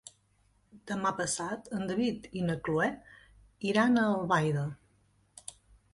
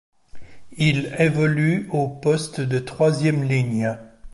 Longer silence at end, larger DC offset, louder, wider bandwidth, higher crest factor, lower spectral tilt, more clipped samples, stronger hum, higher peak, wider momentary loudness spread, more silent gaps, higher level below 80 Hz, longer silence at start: first, 0.45 s vs 0.05 s; neither; second, -31 LUFS vs -21 LUFS; about the same, 11.5 kHz vs 11.5 kHz; about the same, 18 dB vs 16 dB; second, -5 dB/octave vs -6.5 dB/octave; neither; neither; second, -14 dBFS vs -6 dBFS; first, 20 LU vs 6 LU; neither; second, -64 dBFS vs -52 dBFS; first, 0.75 s vs 0.35 s